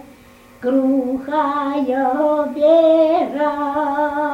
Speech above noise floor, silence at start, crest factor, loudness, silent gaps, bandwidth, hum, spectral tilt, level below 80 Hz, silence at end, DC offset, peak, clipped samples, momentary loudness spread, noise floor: 29 dB; 0.6 s; 14 dB; -17 LUFS; none; 8.6 kHz; none; -6 dB/octave; -56 dBFS; 0 s; under 0.1%; -2 dBFS; under 0.1%; 7 LU; -45 dBFS